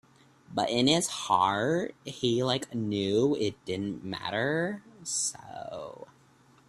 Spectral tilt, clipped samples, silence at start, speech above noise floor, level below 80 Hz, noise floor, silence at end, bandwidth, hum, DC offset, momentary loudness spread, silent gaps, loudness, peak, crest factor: -4 dB/octave; under 0.1%; 0.5 s; 31 dB; -66 dBFS; -60 dBFS; 0.65 s; 13.5 kHz; none; under 0.1%; 15 LU; none; -29 LUFS; -10 dBFS; 20 dB